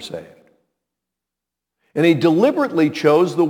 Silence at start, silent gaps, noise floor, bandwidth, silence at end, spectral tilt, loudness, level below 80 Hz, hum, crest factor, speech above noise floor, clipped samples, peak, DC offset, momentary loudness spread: 0 s; none; -85 dBFS; 16 kHz; 0 s; -6.5 dB/octave; -16 LUFS; -68 dBFS; none; 18 dB; 69 dB; under 0.1%; 0 dBFS; under 0.1%; 15 LU